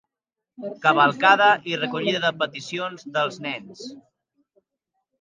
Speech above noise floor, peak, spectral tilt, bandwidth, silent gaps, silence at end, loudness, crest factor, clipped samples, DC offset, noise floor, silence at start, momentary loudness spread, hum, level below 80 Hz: 65 dB; -2 dBFS; -4 dB/octave; 9.4 kHz; none; 1.25 s; -21 LUFS; 22 dB; under 0.1%; under 0.1%; -87 dBFS; 0.6 s; 21 LU; none; -76 dBFS